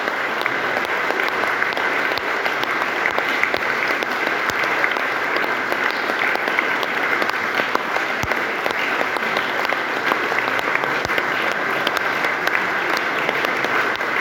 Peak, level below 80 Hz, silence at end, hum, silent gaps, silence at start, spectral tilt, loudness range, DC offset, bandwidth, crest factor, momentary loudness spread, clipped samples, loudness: -2 dBFS; -56 dBFS; 0 s; none; none; 0 s; -3 dB/octave; 1 LU; under 0.1%; 17 kHz; 20 dB; 2 LU; under 0.1%; -19 LUFS